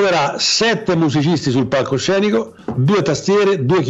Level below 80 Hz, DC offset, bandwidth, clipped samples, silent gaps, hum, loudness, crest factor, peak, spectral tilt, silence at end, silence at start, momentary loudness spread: -52 dBFS; under 0.1%; 8.2 kHz; under 0.1%; none; none; -16 LUFS; 10 dB; -6 dBFS; -5 dB/octave; 0 s; 0 s; 3 LU